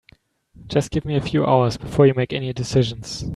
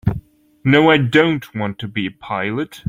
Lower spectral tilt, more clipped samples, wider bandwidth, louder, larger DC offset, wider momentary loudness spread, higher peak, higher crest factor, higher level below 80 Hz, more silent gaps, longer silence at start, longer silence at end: about the same, -6.5 dB/octave vs -7 dB/octave; neither; second, 12 kHz vs 15.5 kHz; second, -20 LUFS vs -17 LUFS; neither; second, 8 LU vs 12 LU; about the same, -2 dBFS vs -2 dBFS; about the same, 18 dB vs 16 dB; about the same, -44 dBFS vs -44 dBFS; neither; first, 0.6 s vs 0.05 s; about the same, 0 s vs 0 s